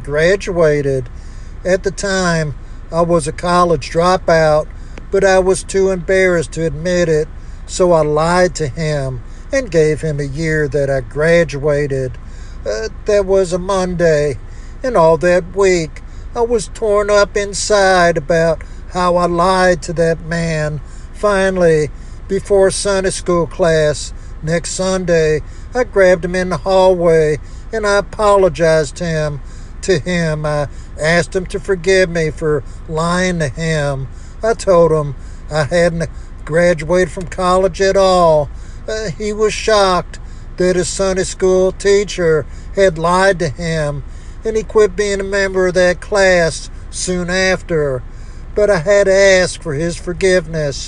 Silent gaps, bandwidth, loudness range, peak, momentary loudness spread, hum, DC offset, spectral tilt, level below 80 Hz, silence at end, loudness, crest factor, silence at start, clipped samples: none; 11 kHz; 3 LU; 0 dBFS; 13 LU; none; under 0.1%; -5 dB/octave; -28 dBFS; 0 s; -15 LUFS; 14 dB; 0 s; under 0.1%